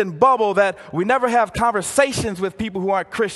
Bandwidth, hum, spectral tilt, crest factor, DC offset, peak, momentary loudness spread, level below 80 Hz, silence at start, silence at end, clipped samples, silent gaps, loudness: 12.5 kHz; none; -4.5 dB/octave; 18 dB; under 0.1%; 0 dBFS; 8 LU; -46 dBFS; 0 s; 0 s; under 0.1%; none; -19 LUFS